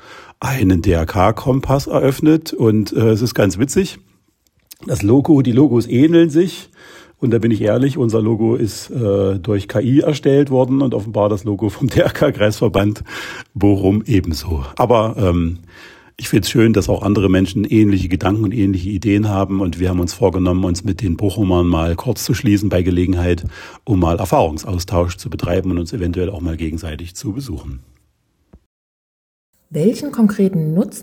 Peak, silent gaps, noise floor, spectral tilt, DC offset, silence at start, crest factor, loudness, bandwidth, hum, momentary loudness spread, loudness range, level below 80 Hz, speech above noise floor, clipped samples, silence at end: 0 dBFS; 28.66-29.53 s; -62 dBFS; -7 dB/octave; under 0.1%; 0.05 s; 16 dB; -16 LUFS; 16.5 kHz; none; 10 LU; 6 LU; -38 dBFS; 47 dB; under 0.1%; 0 s